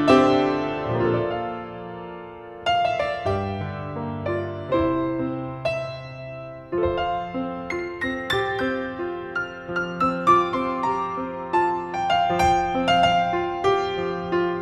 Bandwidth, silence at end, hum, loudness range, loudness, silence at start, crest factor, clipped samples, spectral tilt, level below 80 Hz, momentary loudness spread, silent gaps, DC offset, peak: 13 kHz; 0 s; none; 5 LU; -24 LUFS; 0 s; 20 dB; under 0.1%; -6 dB/octave; -46 dBFS; 12 LU; none; under 0.1%; -4 dBFS